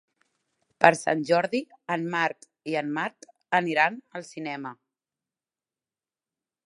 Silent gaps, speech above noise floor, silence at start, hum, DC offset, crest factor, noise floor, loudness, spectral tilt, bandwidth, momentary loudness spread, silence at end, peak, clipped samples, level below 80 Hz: none; over 64 dB; 0.8 s; none; under 0.1%; 28 dB; under -90 dBFS; -26 LUFS; -4.5 dB/octave; 11.5 kHz; 16 LU; 1.95 s; 0 dBFS; under 0.1%; -76 dBFS